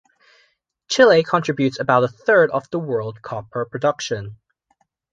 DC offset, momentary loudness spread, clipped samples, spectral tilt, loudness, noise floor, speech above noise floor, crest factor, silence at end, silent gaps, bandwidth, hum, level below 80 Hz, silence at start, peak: under 0.1%; 15 LU; under 0.1%; -5 dB/octave; -19 LUFS; -66 dBFS; 48 dB; 18 dB; 0.8 s; none; 7.8 kHz; none; -60 dBFS; 0.9 s; -2 dBFS